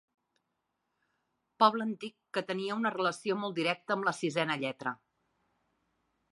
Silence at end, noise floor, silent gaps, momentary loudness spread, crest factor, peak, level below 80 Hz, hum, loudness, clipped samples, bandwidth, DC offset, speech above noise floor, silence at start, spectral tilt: 1.35 s; -83 dBFS; none; 11 LU; 26 dB; -10 dBFS; -84 dBFS; none; -32 LUFS; under 0.1%; 11.5 kHz; under 0.1%; 51 dB; 1.6 s; -4.5 dB/octave